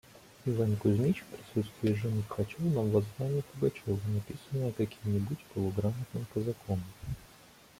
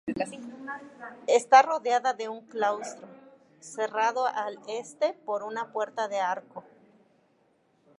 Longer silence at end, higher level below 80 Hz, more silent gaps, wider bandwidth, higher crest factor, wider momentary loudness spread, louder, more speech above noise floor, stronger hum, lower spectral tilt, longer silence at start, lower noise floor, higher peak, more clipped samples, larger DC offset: second, 0.55 s vs 1.35 s; first, -58 dBFS vs -76 dBFS; neither; first, 16 kHz vs 11.5 kHz; second, 18 dB vs 24 dB; second, 8 LU vs 21 LU; second, -33 LUFS vs -27 LUFS; second, 25 dB vs 40 dB; neither; first, -8 dB/octave vs -2.5 dB/octave; about the same, 0.15 s vs 0.05 s; second, -57 dBFS vs -67 dBFS; second, -14 dBFS vs -4 dBFS; neither; neither